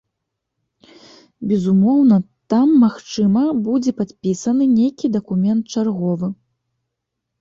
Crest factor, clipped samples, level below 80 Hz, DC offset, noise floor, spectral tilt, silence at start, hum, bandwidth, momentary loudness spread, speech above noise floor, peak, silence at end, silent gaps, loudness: 14 dB; under 0.1%; -58 dBFS; under 0.1%; -78 dBFS; -7.5 dB/octave; 1.4 s; none; 7.6 kHz; 9 LU; 62 dB; -4 dBFS; 1.05 s; none; -17 LUFS